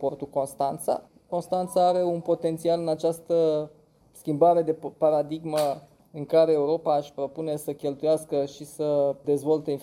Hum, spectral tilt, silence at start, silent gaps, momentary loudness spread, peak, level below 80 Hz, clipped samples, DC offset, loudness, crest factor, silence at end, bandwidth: none; -6.5 dB/octave; 0 s; none; 10 LU; -8 dBFS; -68 dBFS; under 0.1%; under 0.1%; -26 LUFS; 16 dB; 0 s; 16 kHz